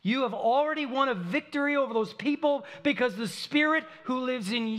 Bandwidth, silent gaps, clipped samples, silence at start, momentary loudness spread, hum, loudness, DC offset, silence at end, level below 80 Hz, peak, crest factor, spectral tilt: 14 kHz; none; under 0.1%; 0.05 s; 5 LU; none; -28 LUFS; under 0.1%; 0 s; -80 dBFS; -12 dBFS; 16 dB; -5 dB/octave